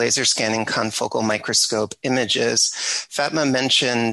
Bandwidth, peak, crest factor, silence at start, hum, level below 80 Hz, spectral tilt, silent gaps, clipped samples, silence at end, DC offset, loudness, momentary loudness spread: 12.5 kHz; -6 dBFS; 14 dB; 0 s; none; -60 dBFS; -2 dB/octave; none; under 0.1%; 0 s; under 0.1%; -19 LUFS; 6 LU